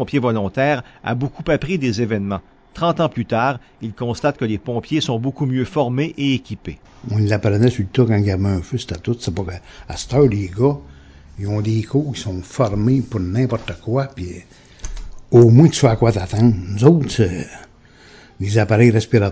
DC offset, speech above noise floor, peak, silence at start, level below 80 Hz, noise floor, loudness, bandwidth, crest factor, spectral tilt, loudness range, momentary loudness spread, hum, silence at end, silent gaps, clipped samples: under 0.1%; 29 dB; 0 dBFS; 0 s; -38 dBFS; -46 dBFS; -18 LUFS; 8 kHz; 18 dB; -7 dB/octave; 6 LU; 16 LU; none; 0 s; none; under 0.1%